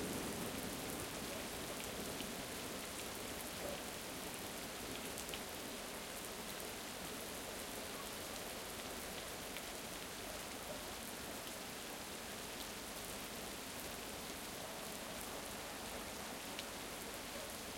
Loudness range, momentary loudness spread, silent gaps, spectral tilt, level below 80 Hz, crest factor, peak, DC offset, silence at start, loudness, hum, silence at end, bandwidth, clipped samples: 2 LU; 2 LU; none; -2.5 dB/octave; -64 dBFS; 24 dB; -24 dBFS; under 0.1%; 0 s; -45 LUFS; none; 0 s; 17 kHz; under 0.1%